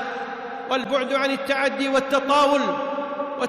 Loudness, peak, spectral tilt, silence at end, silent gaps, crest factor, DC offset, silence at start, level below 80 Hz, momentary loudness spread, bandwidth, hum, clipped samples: -22 LUFS; -10 dBFS; -3.5 dB/octave; 0 s; none; 12 dB; under 0.1%; 0 s; -62 dBFS; 11 LU; 13.5 kHz; none; under 0.1%